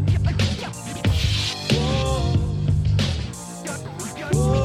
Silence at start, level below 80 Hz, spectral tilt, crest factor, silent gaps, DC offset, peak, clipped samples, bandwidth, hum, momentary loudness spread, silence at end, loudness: 0 s; -30 dBFS; -5.5 dB/octave; 16 dB; none; under 0.1%; -6 dBFS; under 0.1%; 14.5 kHz; none; 10 LU; 0 s; -23 LUFS